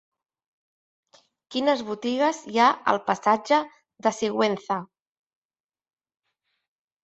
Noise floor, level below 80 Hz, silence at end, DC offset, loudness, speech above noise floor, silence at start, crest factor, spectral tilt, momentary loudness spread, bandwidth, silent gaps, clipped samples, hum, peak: under -90 dBFS; -72 dBFS; 2.2 s; under 0.1%; -24 LUFS; over 67 dB; 1.5 s; 22 dB; -4 dB/octave; 9 LU; 8.2 kHz; none; under 0.1%; none; -6 dBFS